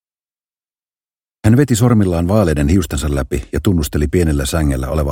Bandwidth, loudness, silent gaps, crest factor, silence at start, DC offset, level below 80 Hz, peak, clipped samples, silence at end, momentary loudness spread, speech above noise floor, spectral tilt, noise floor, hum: 17 kHz; -15 LUFS; none; 16 dB; 1.45 s; under 0.1%; -24 dBFS; 0 dBFS; under 0.1%; 0 s; 7 LU; over 76 dB; -6.5 dB/octave; under -90 dBFS; none